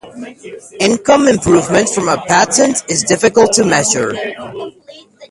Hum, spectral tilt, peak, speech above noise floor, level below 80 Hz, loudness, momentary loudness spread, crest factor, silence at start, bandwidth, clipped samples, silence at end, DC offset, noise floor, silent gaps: none; -3.5 dB/octave; 0 dBFS; 25 dB; -44 dBFS; -12 LUFS; 20 LU; 14 dB; 0.05 s; 11.5 kHz; under 0.1%; 0.05 s; under 0.1%; -38 dBFS; none